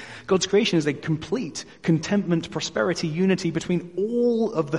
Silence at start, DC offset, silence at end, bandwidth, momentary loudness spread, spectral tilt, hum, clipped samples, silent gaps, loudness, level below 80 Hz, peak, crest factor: 0 s; 0.1%; 0 s; 11.5 kHz; 8 LU; -5.5 dB/octave; none; under 0.1%; none; -24 LUFS; -58 dBFS; -8 dBFS; 16 dB